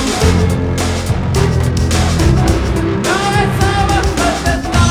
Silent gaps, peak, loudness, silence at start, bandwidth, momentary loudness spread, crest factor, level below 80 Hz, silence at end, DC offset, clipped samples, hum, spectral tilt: none; 0 dBFS; -14 LUFS; 0 s; over 20 kHz; 4 LU; 12 dB; -20 dBFS; 0 s; under 0.1%; under 0.1%; none; -5 dB/octave